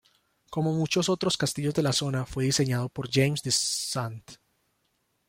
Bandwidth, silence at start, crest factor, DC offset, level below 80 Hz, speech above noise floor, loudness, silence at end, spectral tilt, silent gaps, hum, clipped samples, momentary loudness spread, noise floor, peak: 16.5 kHz; 0.5 s; 18 dB; under 0.1%; -58 dBFS; 47 dB; -27 LUFS; 0.95 s; -4 dB/octave; none; none; under 0.1%; 6 LU; -74 dBFS; -10 dBFS